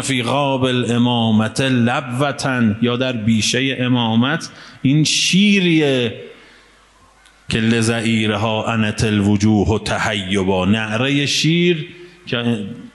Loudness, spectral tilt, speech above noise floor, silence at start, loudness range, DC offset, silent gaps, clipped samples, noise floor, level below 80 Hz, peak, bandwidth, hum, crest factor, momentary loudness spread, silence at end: -17 LUFS; -5 dB/octave; 34 dB; 0 s; 3 LU; under 0.1%; none; under 0.1%; -50 dBFS; -46 dBFS; -2 dBFS; 11.5 kHz; none; 16 dB; 8 LU; 0.05 s